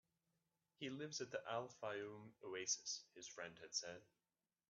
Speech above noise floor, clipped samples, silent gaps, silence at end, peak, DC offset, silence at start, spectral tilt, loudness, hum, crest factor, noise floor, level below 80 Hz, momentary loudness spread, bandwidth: 39 dB; under 0.1%; none; 0.65 s; -28 dBFS; under 0.1%; 0.8 s; -2 dB/octave; -49 LUFS; none; 22 dB; -89 dBFS; under -90 dBFS; 12 LU; 8 kHz